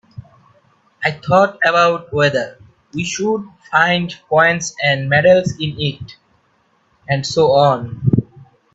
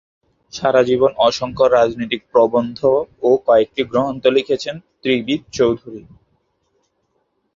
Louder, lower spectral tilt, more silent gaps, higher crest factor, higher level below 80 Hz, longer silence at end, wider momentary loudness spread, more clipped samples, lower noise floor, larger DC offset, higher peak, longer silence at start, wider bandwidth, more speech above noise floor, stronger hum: about the same, -16 LUFS vs -17 LUFS; about the same, -5 dB/octave vs -5 dB/octave; neither; about the same, 16 dB vs 18 dB; about the same, -52 dBFS vs -52 dBFS; second, 0.3 s vs 1.55 s; about the same, 10 LU vs 11 LU; neither; second, -59 dBFS vs -68 dBFS; neither; about the same, 0 dBFS vs 0 dBFS; second, 0.15 s vs 0.55 s; about the same, 8 kHz vs 7.6 kHz; second, 44 dB vs 51 dB; neither